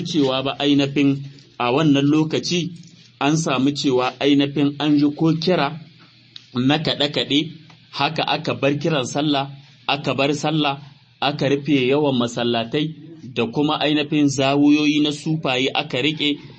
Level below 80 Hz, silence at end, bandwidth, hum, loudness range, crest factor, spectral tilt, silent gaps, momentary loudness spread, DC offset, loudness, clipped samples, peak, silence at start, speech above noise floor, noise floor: -60 dBFS; 0.05 s; 8.6 kHz; none; 2 LU; 16 dB; -5.5 dB/octave; none; 8 LU; under 0.1%; -20 LUFS; under 0.1%; -4 dBFS; 0 s; 29 dB; -48 dBFS